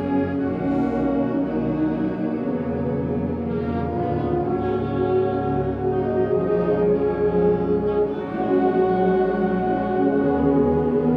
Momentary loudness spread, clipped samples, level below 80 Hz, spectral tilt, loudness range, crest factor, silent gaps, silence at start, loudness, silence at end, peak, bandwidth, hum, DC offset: 5 LU; under 0.1%; -42 dBFS; -10.5 dB/octave; 3 LU; 14 dB; none; 0 s; -22 LUFS; 0 s; -6 dBFS; 5.2 kHz; none; under 0.1%